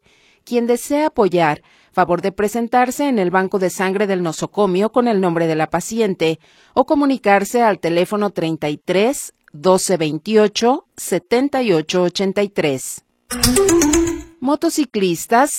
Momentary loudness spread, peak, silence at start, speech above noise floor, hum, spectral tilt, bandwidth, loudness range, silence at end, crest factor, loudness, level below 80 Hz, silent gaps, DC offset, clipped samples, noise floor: 8 LU; 0 dBFS; 0.45 s; 32 dB; none; -4.5 dB/octave; 16.5 kHz; 1 LU; 0 s; 18 dB; -17 LUFS; -42 dBFS; none; under 0.1%; under 0.1%; -48 dBFS